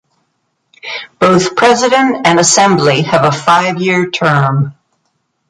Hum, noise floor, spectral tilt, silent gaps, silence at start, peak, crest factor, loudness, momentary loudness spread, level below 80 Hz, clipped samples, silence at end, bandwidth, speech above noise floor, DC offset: none; -65 dBFS; -4 dB/octave; none; 0.85 s; 0 dBFS; 12 dB; -10 LUFS; 12 LU; -52 dBFS; under 0.1%; 0.8 s; 11.5 kHz; 55 dB; under 0.1%